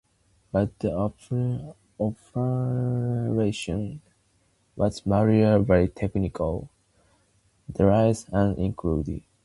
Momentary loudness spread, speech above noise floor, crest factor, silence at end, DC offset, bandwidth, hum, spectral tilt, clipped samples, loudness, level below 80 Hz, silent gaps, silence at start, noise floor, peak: 11 LU; 42 dB; 20 dB; 0.25 s; under 0.1%; 11.5 kHz; none; -8 dB/octave; under 0.1%; -25 LUFS; -42 dBFS; none; 0.55 s; -66 dBFS; -6 dBFS